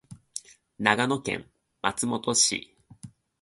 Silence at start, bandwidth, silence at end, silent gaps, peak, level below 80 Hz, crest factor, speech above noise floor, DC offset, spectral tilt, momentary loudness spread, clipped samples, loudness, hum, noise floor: 0.1 s; 12 kHz; 0.35 s; none; -2 dBFS; -64 dBFS; 28 dB; 23 dB; under 0.1%; -2 dB/octave; 18 LU; under 0.1%; -26 LUFS; none; -49 dBFS